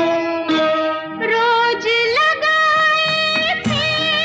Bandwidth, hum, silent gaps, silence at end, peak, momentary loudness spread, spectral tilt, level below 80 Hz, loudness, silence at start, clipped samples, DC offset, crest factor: 9 kHz; none; none; 0 s; -6 dBFS; 6 LU; -3.5 dB/octave; -62 dBFS; -16 LUFS; 0 s; under 0.1%; under 0.1%; 10 dB